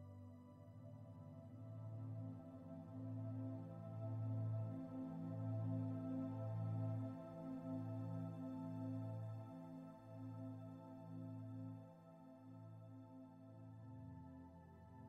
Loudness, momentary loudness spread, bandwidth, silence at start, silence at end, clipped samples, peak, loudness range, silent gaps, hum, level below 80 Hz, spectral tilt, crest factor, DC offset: -51 LUFS; 15 LU; 4.6 kHz; 0 s; 0 s; under 0.1%; -34 dBFS; 10 LU; none; none; -82 dBFS; -10.5 dB/octave; 16 dB; under 0.1%